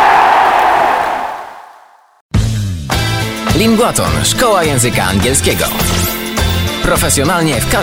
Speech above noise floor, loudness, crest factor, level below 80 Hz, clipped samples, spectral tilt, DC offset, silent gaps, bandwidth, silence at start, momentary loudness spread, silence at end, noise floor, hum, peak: 31 dB; -12 LUFS; 12 dB; -26 dBFS; under 0.1%; -4 dB/octave; under 0.1%; 2.21-2.29 s; 18.5 kHz; 0 s; 8 LU; 0 s; -43 dBFS; none; 0 dBFS